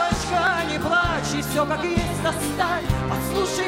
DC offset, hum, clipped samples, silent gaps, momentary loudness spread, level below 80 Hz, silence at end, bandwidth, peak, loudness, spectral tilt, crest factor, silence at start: under 0.1%; none; under 0.1%; none; 4 LU; -36 dBFS; 0 s; 16 kHz; -8 dBFS; -23 LUFS; -4.5 dB/octave; 16 dB; 0 s